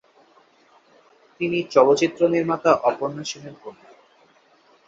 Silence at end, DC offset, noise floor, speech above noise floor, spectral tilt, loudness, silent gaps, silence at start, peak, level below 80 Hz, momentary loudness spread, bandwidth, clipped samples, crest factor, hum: 1.15 s; under 0.1%; -57 dBFS; 37 dB; -5 dB/octave; -20 LUFS; none; 1.4 s; -2 dBFS; -66 dBFS; 20 LU; 7.8 kHz; under 0.1%; 22 dB; none